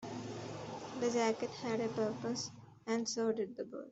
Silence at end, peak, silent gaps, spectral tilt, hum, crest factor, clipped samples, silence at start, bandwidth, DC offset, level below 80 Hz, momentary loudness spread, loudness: 0 s; -20 dBFS; none; -4.5 dB/octave; none; 18 dB; under 0.1%; 0 s; 8.2 kHz; under 0.1%; -76 dBFS; 11 LU; -38 LUFS